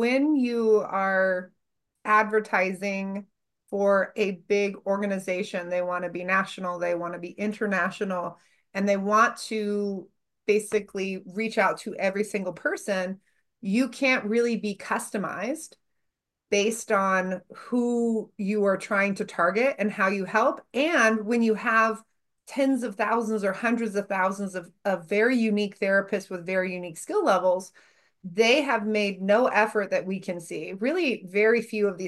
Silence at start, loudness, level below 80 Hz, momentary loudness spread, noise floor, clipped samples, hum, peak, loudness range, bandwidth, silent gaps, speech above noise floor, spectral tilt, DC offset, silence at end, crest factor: 0 s; -26 LUFS; -76 dBFS; 10 LU; -80 dBFS; under 0.1%; none; -8 dBFS; 4 LU; 12.5 kHz; none; 55 dB; -5 dB/octave; under 0.1%; 0 s; 18 dB